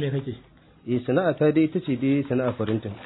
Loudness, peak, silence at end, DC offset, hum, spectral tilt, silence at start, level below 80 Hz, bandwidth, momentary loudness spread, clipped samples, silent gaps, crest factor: -24 LUFS; -8 dBFS; 0 s; under 0.1%; none; -12 dB/octave; 0 s; -60 dBFS; 4.1 kHz; 13 LU; under 0.1%; none; 16 dB